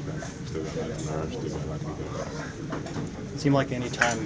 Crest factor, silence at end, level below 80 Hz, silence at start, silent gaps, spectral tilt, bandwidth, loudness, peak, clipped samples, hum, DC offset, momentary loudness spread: 26 dB; 0 s; -46 dBFS; 0 s; none; -5.5 dB/octave; 8 kHz; -30 LUFS; -4 dBFS; under 0.1%; none; under 0.1%; 10 LU